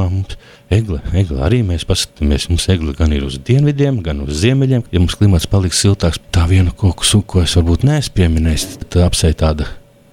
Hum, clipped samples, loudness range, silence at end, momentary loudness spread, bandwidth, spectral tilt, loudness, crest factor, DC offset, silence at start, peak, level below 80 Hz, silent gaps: none; under 0.1%; 2 LU; 0.35 s; 6 LU; 15.5 kHz; -5.5 dB/octave; -15 LUFS; 12 dB; under 0.1%; 0 s; -2 dBFS; -22 dBFS; none